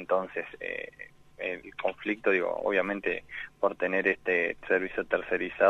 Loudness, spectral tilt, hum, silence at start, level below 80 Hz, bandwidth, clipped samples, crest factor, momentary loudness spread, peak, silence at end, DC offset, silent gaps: -30 LUFS; -6.5 dB/octave; 50 Hz at -70 dBFS; 0 s; -62 dBFS; 7.8 kHz; under 0.1%; 22 dB; 10 LU; -8 dBFS; 0 s; under 0.1%; none